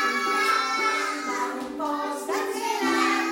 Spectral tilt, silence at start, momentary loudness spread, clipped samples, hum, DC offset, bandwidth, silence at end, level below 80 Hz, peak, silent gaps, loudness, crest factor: -1 dB/octave; 0 s; 7 LU; under 0.1%; none; under 0.1%; 16.5 kHz; 0 s; -70 dBFS; -10 dBFS; none; -25 LUFS; 16 dB